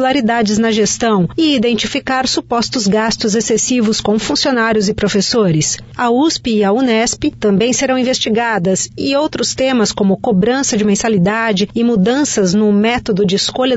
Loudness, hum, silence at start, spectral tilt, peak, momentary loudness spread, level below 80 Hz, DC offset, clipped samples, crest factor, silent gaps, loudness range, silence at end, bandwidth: -14 LUFS; none; 0 s; -4 dB/octave; -4 dBFS; 3 LU; -42 dBFS; under 0.1%; under 0.1%; 10 dB; none; 1 LU; 0 s; 8 kHz